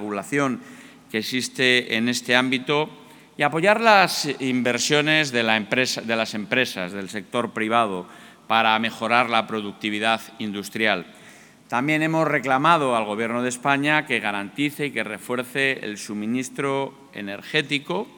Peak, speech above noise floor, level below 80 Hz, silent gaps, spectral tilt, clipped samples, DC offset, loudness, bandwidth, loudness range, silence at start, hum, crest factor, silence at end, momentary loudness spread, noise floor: 0 dBFS; 25 dB; -74 dBFS; none; -3.5 dB/octave; under 0.1%; under 0.1%; -22 LUFS; 19.5 kHz; 4 LU; 0 s; none; 22 dB; 0.1 s; 11 LU; -48 dBFS